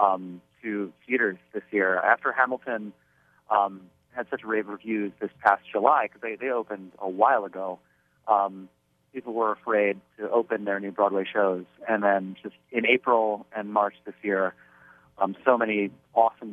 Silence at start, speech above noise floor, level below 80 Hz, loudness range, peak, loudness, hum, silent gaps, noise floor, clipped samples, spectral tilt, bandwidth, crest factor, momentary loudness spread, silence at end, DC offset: 0 s; 30 dB; -78 dBFS; 3 LU; -4 dBFS; -26 LUFS; none; none; -56 dBFS; under 0.1%; -7.5 dB/octave; 5 kHz; 22 dB; 13 LU; 0 s; under 0.1%